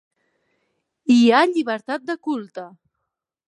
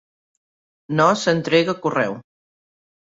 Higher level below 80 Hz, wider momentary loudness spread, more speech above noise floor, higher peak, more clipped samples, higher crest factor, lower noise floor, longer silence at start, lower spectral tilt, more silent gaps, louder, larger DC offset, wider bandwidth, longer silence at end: second, -78 dBFS vs -64 dBFS; first, 18 LU vs 9 LU; second, 62 dB vs over 71 dB; about the same, -2 dBFS vs -2 dBFS; neither; about the same, 20 dB vs 20 dB; second, -81 dBFS vs under -90 dBFS; first, 1.05 s vs 0.9 s; about the same, -4.5 dB/octave vs -5 dB/octave; neither; about the same, -19 LUFS vs -19 LUFS; neither; first, 10.5 kHz vs 8 kHz; second, 0.8 s vs 0.95 s